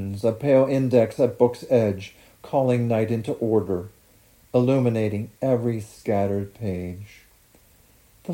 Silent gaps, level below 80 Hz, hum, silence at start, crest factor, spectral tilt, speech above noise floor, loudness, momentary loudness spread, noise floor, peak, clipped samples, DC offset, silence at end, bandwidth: none; -60 dBFS; none; 0 s; 18 dB; -8.5 dB/octave; 34 dB; -23 LUFS; 11 LU; -56 dBFS; -6 dBFS; under 0.1%; under 0.1%; 0 s; 17 kHz